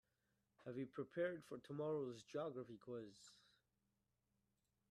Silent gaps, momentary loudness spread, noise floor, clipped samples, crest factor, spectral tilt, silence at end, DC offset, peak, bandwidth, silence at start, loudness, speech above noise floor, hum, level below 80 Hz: none; 15 LU; -88 dBFS; under 0.1%; 20 dB; -6.5 dB/octave; 1.55 s; under 0.1%; -32 dBFS; 13 kHz; 0.6 s; -49 LUFS; 39 dB; 60 Hz at -80 dBFS; -88 dBFS